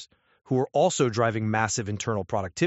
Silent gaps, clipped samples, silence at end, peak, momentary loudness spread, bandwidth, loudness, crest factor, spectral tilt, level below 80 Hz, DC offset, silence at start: none; under 0.1%; 0 s; -8 dBFS; 6 LU; 8 kHz; -26 LUFS; 18 dB; -5 dB/octave; -60 dBFS; under 0.1%; 0 s